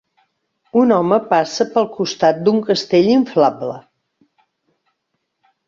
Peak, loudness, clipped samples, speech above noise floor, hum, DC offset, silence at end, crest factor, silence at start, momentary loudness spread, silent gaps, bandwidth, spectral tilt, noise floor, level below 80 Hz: -2 dBFS; -16 LUFS; under 0.1%; 58 dB; none; under 0.1%; 1.9 s; 16 dB; 0.75 s; 7 LU; none; 7.6 kHz; -5.5 dB/octave; -73 dBFS; -62 dBFS